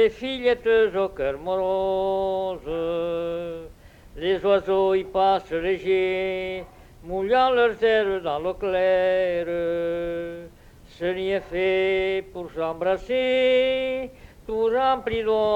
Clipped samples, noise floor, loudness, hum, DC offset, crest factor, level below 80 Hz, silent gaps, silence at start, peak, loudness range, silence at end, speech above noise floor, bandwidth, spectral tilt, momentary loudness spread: under 0.1%; -46 dBFS; -23 LUFS; none; under 0.1%; 16 dB; -48 dBFS; none; 0 s; -8 dBFS; 4 LU; 0 s; 23 dB; 9.2 kHz; -6 dB/octave; 10 LU